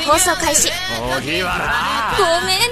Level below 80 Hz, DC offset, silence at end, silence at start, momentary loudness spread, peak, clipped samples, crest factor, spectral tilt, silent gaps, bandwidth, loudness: -36 dBFS; under 0.1%; 0 s; 0 s; 6 LU; 0 dBFS; under 0.1%; 16 dB; -1.5 dB/octave; none; 14 kHz; -16 LUFS